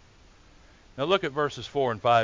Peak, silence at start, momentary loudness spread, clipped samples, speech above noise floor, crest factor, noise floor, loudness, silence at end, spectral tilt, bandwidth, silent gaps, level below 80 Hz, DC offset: -8 dBFS; 0.95 s; 8 LU; under 0.1%; 30 dB; 18 dB; -55 dBFS; -27 LUFS; 0 s; -5.5 dB/octave; 7.6 kHz; none; -58 dBFS; under 0.1%